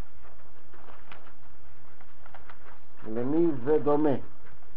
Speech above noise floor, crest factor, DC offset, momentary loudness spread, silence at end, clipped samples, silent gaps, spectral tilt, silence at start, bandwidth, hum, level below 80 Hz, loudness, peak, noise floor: 31 dB; 18 dB; 7%; 26 LU; 0.5 s; under 0.1%; none; -8 dB/octave; 1.1 s; 4.7 kHz; none; -60 dBFS; -27 LUFS; -14 dBFS; -57 dBFS